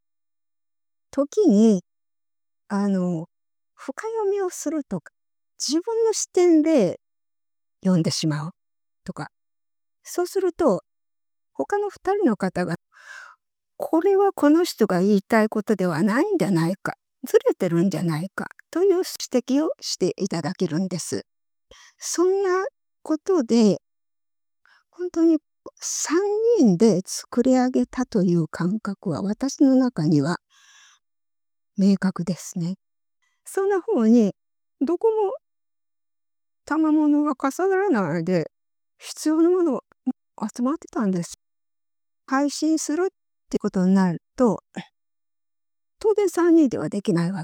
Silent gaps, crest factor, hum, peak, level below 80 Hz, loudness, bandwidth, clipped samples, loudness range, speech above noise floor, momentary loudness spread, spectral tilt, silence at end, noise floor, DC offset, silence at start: none; 18 dB; none; -4 dBFS; -64 dBFS; -22 LUFS; 17.5 kHz; under 0.1%; 6 LU; over 69 dB; 14 LU; -6 dB/octave; 0 s; under -90 dBFS; under 0.1%; 1.15 s